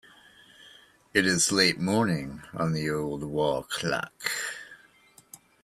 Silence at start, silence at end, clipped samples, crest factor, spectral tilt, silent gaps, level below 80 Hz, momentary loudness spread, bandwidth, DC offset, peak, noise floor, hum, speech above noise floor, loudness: 0.6 s; 0.3 s; under 0.1%; 22 dB; -3.5 dB/octave; none; -60 dBFS; 11 LU; 15.5 kHz; under 0.1%; -8 dBFS; -58 dBFS; none; 31 dB; -27 LUFS